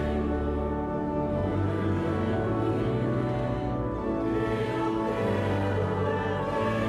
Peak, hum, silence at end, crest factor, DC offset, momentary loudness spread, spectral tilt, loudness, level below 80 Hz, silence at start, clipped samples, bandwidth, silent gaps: -16 dBFS; none; 0 s; 12 dB; under 0.1%; 2 LU; -8.5 dB/octave; -28 LUFS; -40 dBFS; 0 s; under 0.1%; 11 kHz; none